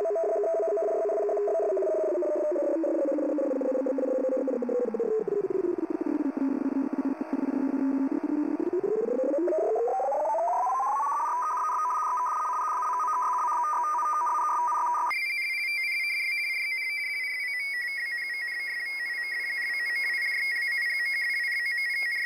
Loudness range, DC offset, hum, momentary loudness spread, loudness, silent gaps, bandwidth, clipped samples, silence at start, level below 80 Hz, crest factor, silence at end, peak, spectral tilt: 2 LU; under 0.1%; none; 3 LU; -27 LUFS; none; 16 kHz; under 0.1%; 0 s; -78 dBFS; 10 dB; 0 s; -18 dBFS; -3.5 dB/octave